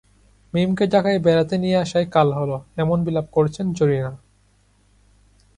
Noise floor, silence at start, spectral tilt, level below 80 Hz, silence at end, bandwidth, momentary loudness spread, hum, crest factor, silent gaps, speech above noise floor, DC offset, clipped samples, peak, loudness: -59 dBFS; 0.55 s; -7 dB/octave; -52 dBFS; 1.4 s; 11 kHz; 7 LU; 50 Hz at -50 dBFS; 18 dB; none; 39 dB; under 0.1%; under 0.1%; -4 dBFS; -20 LUFS